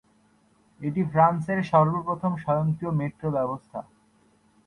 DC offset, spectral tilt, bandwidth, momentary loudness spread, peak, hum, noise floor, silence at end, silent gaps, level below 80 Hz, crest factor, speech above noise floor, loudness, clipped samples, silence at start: under 0.1%; -9.5 dB/octave; 9.6 kHz; 13 LU; -6 dBFS; none; -63 dBFS; 0.85 s; none; -60 dBFS; 20 dB; 38 dB; -25 LUFS; under 0.1%; 0.8 s